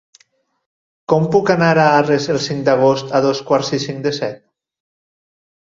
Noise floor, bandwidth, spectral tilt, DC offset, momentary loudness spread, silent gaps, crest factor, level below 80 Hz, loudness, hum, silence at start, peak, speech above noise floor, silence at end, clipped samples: -59 dBFS; 7.6 kHz; -5.5 dB/octave; under 0.1%; 9 LU; none; 16 dB; -58 dBFS; -16 LUFS; none; 1.1 s; 0 dBFS; 44 dB; 1.3 s; under 0.1%